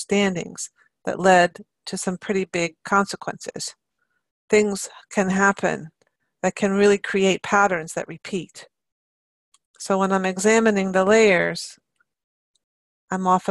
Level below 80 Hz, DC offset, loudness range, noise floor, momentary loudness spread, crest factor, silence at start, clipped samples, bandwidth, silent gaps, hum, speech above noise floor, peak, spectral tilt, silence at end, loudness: -60 dBFS; under 0.1%; 4 LU; -74 dBFS; 15 LU; 18 dB; 0 s; under 0.1%; 12.5 kHz; 4.31-4.48 s, 8.92-9.52 s, 9.65-9.74 s, 12.24-12.54 s, 12.64-13.08 s; none; 54 dB; -4 dBFS; -4.5 dB/octave; 0 s; -21 LUFS